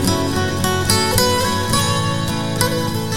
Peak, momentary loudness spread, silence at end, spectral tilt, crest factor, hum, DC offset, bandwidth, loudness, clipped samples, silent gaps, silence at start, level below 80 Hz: 0 dBFS; 5 LU; 0 s; -4 dB/octave; 18 dB; none; 2%; 17.5 kHz; -17 LUFS; under 0.1%; none; 0 s; -34 dBFS